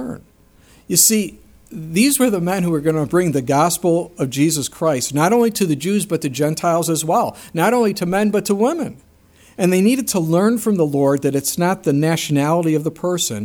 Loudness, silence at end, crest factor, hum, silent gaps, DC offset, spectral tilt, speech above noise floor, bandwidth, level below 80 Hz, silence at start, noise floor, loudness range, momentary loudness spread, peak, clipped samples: -17 LUFS; 0 s; 18 dB; none; none; under 0.1%; -4.5 dB/octave; 33 dB; over 20 kHz; -54 dBFS; 0 s; -50 dBFS; 1 LU; 6 LU; 0 dBFS; under 0.1%